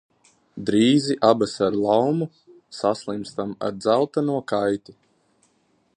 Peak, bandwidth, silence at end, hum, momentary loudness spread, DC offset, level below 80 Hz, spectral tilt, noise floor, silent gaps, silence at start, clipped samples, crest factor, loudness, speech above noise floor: -2 dBFS; 10.5 kHz; 1.05 s; none; 12 LU; under 0.1%; -62 dBFS; -6 dB/octave; -65 dBFS; none; 0.55 s; under 0.1%; 22 dB; -22 LUFS; 44 dB